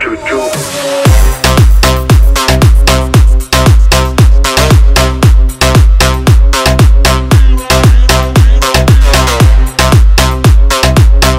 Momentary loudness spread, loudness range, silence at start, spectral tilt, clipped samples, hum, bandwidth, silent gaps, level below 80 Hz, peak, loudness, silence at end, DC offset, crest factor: 2 LU; 0 LU; 0 s; -5 dB/octave; 0.5%; none; 16.5 kHz; none; -8 dBFS; 0 dBFS; -7 LUFS; 0 s; under 0.1%; 6 dB